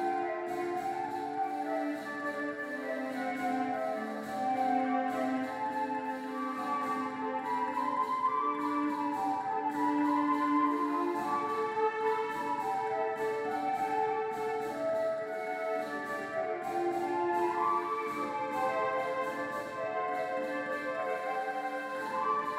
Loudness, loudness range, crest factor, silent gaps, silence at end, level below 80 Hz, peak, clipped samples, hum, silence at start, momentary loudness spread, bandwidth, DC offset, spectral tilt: -33 LUFS; 4 LU; 14 dB; none; 0 s; -76 dBFS; -18 dBFS; under 0.1%; none; 0 s; 6 LU; 16 kHz; under 0.1%; -5 dB/octave